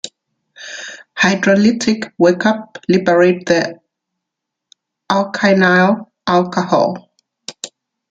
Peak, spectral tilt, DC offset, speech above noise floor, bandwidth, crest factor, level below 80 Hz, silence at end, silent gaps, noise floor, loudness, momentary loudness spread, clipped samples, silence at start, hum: 0 dBFS; -5.5 dB/octave; under 0.1%; 66 dB; 9.2 kHz; 16 dB; -58 dBFS; 0.45 s; none; -80 dBFS; -14 LUFS; 20 LU; under 0.1%; 0.05 s; none